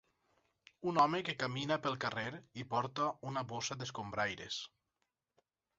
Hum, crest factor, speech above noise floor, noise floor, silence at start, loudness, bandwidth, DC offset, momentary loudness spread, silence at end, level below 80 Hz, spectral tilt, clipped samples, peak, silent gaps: none; 22 dB; 49 dB; -87 dBFS; 0.8 s; -37 LUFS; 7.6 kHz; under 0.1%; 11 LU; 1.1 s; -72 dBFS; -3 dB/octave; under 0.1%; -16 dBFS; none